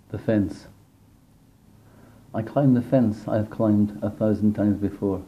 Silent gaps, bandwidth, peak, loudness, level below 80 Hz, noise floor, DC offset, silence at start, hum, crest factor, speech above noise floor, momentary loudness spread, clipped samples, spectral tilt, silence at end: none; 10 kHz; -8 dBFS; -23 LUFS; -56 dBFS; -55 dBFS; under 0.1%; 0.1 s; none; 16 dB; 33 dB; 9 LU; under 0.1%; -9.5 dB/octave; 0 s